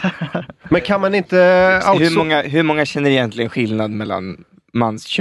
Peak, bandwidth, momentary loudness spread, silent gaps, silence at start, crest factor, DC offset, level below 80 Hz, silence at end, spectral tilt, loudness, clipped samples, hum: 0 dBFS; 12 kHz; 13 LU; none; 0 s; 16 dB; under 0.1%; -48 dBFS; 0 s; -6 dB/octave; -16 LUFS; under 0.1%; none